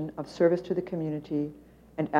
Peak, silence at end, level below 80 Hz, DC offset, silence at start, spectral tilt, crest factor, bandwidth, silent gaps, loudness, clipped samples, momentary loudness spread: -10 dBFS; 0 s; -62 dBFS; under 0.1%; 0 s; -8 dB/octave; 18 dB; 10 kHz; none; -30 LUFS; under 0.1%; 12 LU